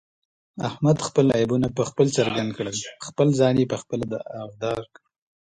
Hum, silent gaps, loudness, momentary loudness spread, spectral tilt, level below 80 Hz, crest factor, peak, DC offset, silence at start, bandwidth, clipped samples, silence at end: none; none; -23 LUFS; 12 LU; -6 dB/octave; -56 dBFS; 18 dB; -4 dBFS; under 0.1%; 0.55 s; 10.5 kHz; under 0.1%; 0.65 s